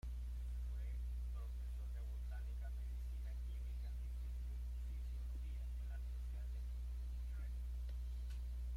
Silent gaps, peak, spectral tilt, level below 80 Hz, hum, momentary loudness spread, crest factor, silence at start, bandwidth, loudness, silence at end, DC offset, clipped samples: none; -38 dBFS; -6.5 dB/octave; -44 dBFS; 60 Hz at -45 dBFS; 1 LU; 6 dB; 0.05 s; 11.5 kHz; -48 LUFS; 0 s; under 0.1%; under 0.1%